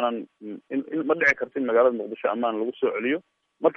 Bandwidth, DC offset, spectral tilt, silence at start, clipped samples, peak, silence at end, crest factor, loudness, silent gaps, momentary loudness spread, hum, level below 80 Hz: 6.6 kHz; under 0.1%; -5.5 dB/octave; 0 s; under 0.1%; -8 dBFS; 0.05 s; 18 dB; -25 LUFS; none; 11 LU; none; -70 dBFS